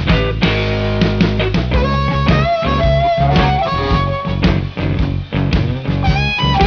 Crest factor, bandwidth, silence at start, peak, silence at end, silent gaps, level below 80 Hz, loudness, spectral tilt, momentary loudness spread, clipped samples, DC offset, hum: 14 dB; 5.4 kHz; 0 s; 0 dBFS; 0 s; none; -22 dBFS; -15 LUFS; -7.5 dB/octave; 5 LU; under 0.1%; under 0.1%; none